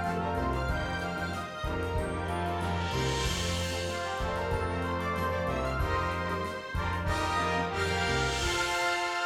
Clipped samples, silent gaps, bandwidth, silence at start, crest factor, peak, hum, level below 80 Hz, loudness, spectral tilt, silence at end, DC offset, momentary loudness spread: under 0.1%; none; 16 kHz; 0 s; 14 dB; -16 dBFS; none; -40 dBFS; -31 LUFS; -4.5 dB/octave; 0 s; under 0.1%; 5 LU